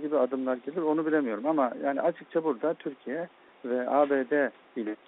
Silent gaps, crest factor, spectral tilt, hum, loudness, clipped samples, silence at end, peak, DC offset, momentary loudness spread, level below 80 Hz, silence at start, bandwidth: none; 18 dB; -5 dB/octave; none; -29 LUFS; under 0.1%; 0.15 s; -12 dBFS; under 0.1%; 11 LU; -80 dBFS; 0 s; 4 kHz